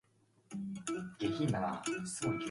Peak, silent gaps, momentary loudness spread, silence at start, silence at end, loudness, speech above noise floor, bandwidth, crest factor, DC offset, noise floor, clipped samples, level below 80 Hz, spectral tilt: -22 dBFS; none; 9 LU; 0.5 s; 0 s; -38 LUFS; 29 dB; 11.5 kHz; 16 dB; under 0.1%; -65 dBFS; under 0.1%; -68 dBFS; -5 dB/octave